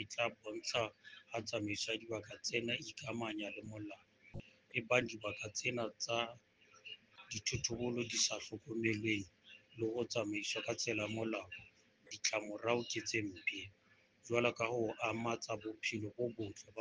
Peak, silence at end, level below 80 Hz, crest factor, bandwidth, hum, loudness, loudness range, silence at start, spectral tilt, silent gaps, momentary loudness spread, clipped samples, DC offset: -16 dBFS; 0 s; -72 dBFS; 26 dB; 10 kHz; none; -39 LUFS; 2 LU; 0 s; -3 dB/octave; none; 17 LU; under 0.1%; under 0.1%